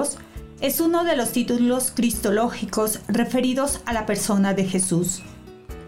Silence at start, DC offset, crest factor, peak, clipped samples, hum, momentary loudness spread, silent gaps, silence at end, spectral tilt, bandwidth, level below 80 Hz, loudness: 0 s; 0.4%; 12 dB; -12 dBFS; under 0.1%; none; 7 LU; none; 0 s; -4.5 dB/octave; 16 kHz; -44 dBFS; -22 LUFS